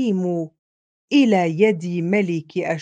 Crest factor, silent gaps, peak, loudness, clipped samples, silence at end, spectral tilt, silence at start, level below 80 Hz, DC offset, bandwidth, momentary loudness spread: 18 dB; 0.59-1.08 s; -2 dBFS; -20 LUFS; under 0.1%; 0 s; -7 dB/octave; 0 s; -70 dBFS; under 0.1%; 9 kHz; 8 LU